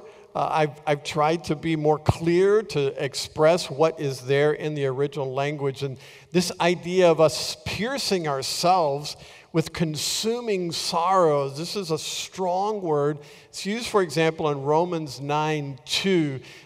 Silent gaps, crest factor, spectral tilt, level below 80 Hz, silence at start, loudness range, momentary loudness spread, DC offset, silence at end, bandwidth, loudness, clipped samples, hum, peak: none; 20 dB; -4.5 dB/octave; -54 dBFS; 0 s; 2 LU; 9 LU; under 0.1%; 0.05 s; 16 kHz; -24 LUFS; under 0.1%; none; -4 dBFS